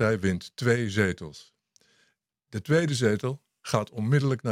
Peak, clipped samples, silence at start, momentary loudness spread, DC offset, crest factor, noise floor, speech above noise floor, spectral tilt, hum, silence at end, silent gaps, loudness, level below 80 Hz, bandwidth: -4 dBFS; under 0.1%; 0 s; 14 LU; under 0.1%; 22 dB; -72 dBFS; 46 dB; -6 dB/octave; none; 0 s; none; -27 LUFS; -62 dBFS; 15 kHz